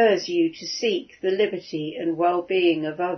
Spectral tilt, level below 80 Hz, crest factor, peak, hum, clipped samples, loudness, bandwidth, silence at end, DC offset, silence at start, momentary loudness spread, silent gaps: -4.5 dB/octave; -70 dBFS; 16 dB; -8 dBFS; none; under 0.1%; -24 LUFS; 6.4 kHz; 0 s; under 0.1%; 0 s; 7 LU; none